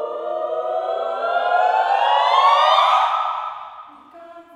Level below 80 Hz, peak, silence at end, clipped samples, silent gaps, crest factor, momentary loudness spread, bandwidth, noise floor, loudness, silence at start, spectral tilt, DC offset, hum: -74 dBFS; -2 dBFS; 0.15 s; under 0.1%; none; 16 dB; 13 LU; 11.5 kHz; -42 dBFS; -18 LUFS; 0 s; 0 dB/octave; under 0.1%; none